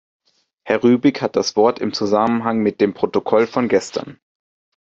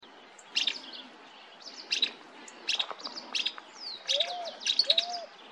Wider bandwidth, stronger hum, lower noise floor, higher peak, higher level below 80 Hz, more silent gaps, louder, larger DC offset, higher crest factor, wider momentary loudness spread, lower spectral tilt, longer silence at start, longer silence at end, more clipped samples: second, 8 kHz vs 13.5 kHz; neither; second, -46 dBFS vs -53 dBFS; first, -2 dBFS vs -8 dBFS; first, -60 dBFS vs -86 dBFS; neither; first, -18 LUFS vs -30 LUFS; neither; second, 16 dB vs 26 dB; second, 6 LU vs 21 LU; first, -5.5 dB/octave vs 1.5 dB/octave; first, 0.65 s vs 0 s; first, 0.7 s vs 0 s; neither